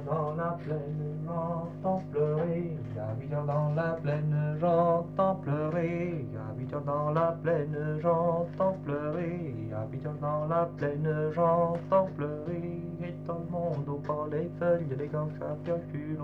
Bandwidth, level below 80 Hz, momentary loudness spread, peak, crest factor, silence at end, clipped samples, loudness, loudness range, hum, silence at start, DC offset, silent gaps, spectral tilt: 4.7 kHz; -60 dBFS; 9 LU; -16 dBFS; 16 dB; 0 s; under 0.1%; -31 LUFS; 3 LU; 50 Hz at -50 dBFS; 0 s; under 0.1%; none; -10.5 dB/octave